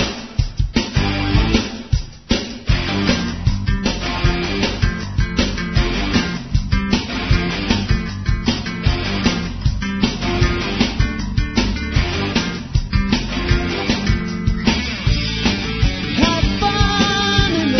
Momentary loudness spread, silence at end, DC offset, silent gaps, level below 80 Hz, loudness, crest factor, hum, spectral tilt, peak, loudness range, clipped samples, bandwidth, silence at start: 5 LU; 0 s; under 0.1%; none; -24 dBFS; -19 LUFS; 18 dB; none; -5 dB/octave; 0 dBFS; 2 LU; under 0.1%; 6.4 kHz; 0 s